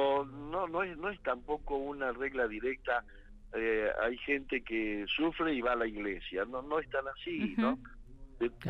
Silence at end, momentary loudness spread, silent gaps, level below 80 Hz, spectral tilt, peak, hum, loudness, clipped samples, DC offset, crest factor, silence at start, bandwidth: 0 s; 6 LU; none; -54 dBFS; -7 dB/octave; -18 dBFS; none; -35 LUFS; under 0.1%; under 0.1%; 16 dB; 0 s; 6.4 kHz